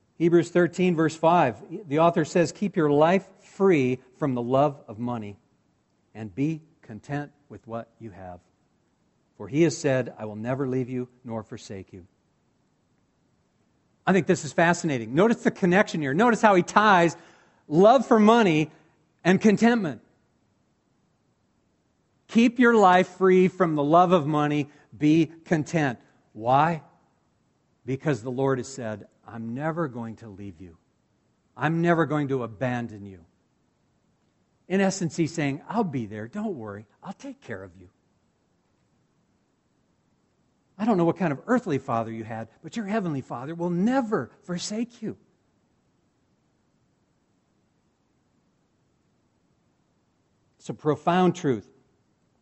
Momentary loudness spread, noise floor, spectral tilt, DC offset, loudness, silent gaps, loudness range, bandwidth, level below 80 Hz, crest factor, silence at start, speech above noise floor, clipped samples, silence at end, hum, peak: 20 LU; -69 dBFS; -6.5 dB/octave; under 0.1%; -24 LUFS; none; 15 LU; 8.2 kHz; -66 dBFS; 24 dB; 0.2 s; 45 dB; under 0.1%; 0.8 s; none; -2 dBFS